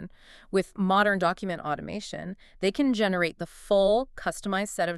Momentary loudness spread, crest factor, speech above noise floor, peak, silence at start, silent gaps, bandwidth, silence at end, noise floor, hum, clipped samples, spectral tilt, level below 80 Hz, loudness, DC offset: 14 LU; 18 dB; 19 dB; -10 dBFS; 0 s; none; 13 kHz; 0 s; -46 dBFS; none; under 0.1%; -5 dB/octave; -52 dBFS; -27 LUFS; under 0.1%